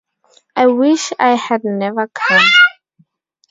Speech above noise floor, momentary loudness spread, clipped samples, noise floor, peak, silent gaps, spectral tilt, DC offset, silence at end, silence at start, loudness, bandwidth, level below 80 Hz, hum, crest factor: 44 dB; 11 LU; under 0.1%; -57 dBFS; 0 dBFS; none; -3 dB/octave; under 0.1%; 0.8 s; 0.55 s; -12 LUFS; 7.8 kHz; -66 dBFS; none; 14 dB